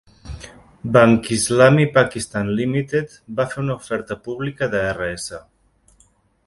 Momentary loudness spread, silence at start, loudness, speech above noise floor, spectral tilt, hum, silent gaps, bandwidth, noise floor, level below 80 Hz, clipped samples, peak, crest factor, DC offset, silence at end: 19 LU; 0.25 s; -19 LUFS; 40 dB; -5.5 dB/octave; none; none; 11.5 kHz; -58 dBFS; -46 dBFS; under 0.1%; 0 dBFS; 20 dB; under 0.1%; 1.05 s